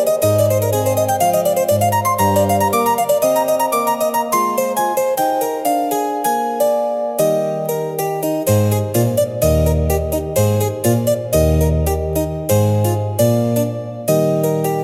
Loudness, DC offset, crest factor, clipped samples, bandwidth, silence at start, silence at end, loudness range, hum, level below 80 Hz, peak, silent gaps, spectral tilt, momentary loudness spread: -17 LUFS; under 0.1%; 14 dB; under 0.1%; 17 kHz; 0 s; 0 s; 2 LU; none; -32 dBFS; -2 dBFS; none; -6 dB/octave; 4 LU